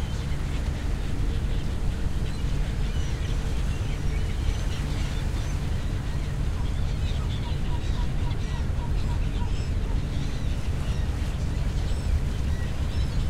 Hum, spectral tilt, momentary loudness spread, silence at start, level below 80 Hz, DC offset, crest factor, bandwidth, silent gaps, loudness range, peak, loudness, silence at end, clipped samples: none; -6 dB/octave; 1 LU; 0 s; -28 dBFS; under 0.1%; 14 dB; 13.5 kHz; none; 1 LU; -12 dBFS; -30 LUFS; 0 s; under 0.1%